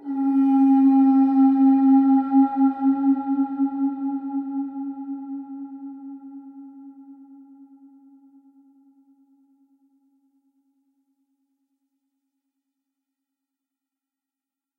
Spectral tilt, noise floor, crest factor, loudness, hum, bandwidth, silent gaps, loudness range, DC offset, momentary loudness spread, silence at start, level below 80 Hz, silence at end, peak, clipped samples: -9 dB/octave; -89 dBFS; 16 dB; -19 LUFS; none; 2.6 kHz; none; 23 LU; under 0.1%; 22 LU; 0.05 s; -82 dBFS; 7.65 s; -8 dBFS; under 0.1%